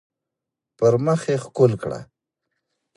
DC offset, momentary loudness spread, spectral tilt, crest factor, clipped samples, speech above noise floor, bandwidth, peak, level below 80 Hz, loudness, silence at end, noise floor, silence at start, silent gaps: under 0.1%; 12 LU; -7.5 dB/octave; 20 dB; under 0.1%; 65 dB; 11 kHz; -4 dBFS; -58 dBFS; -21 LUFS; 0.9 s; -85 dBFS; 0.8 s; none